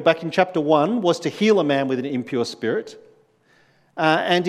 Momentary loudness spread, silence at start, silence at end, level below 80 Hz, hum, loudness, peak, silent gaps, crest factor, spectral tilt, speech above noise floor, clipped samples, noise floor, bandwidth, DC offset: 8 LU; 0 s; 0 s; -74 dBFS; none; -21 LUFS; -2 dBFS; none; 20 dB; -5.5 dB/octave; 39 dB; under 0.1%; -59 dBFS; 13 kHz; under 0.1%